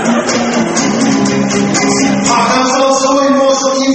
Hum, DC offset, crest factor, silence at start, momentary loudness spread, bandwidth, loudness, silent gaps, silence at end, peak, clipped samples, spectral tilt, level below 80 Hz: none; under 0.1%; 10 dB; 0 s; 3 LU; 8.8 kHz; -11 LUFS; none; 0 s; 0 dBFS; under 0.1%; -3.5 dB/octave; -46 dBFS